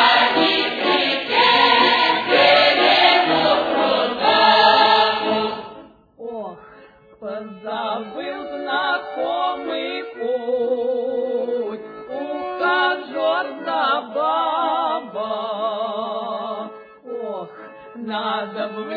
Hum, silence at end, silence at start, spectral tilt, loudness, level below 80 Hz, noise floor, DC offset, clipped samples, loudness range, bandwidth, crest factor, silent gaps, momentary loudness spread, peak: none; 0 s; 0 s; -4.5 dB/octave; -18 LUFS; -62 dBFS; -47 dBFS; under 0.1%; under 0.1%; 13 LU; 5 kHz; 18 dB; none; 18 LU; -2 dBFS